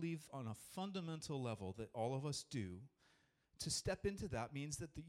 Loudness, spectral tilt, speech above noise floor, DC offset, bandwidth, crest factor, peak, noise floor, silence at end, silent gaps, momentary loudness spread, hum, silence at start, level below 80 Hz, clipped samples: -46 LUFS; -4.5 dB/octave; 31 dB; under 0.1%; 16 kHz; 16 dB; -30 dBFS; -77 dBFS; 0 s; none; 8 LU; none; 0 s; -66 dBFS; under 0.1%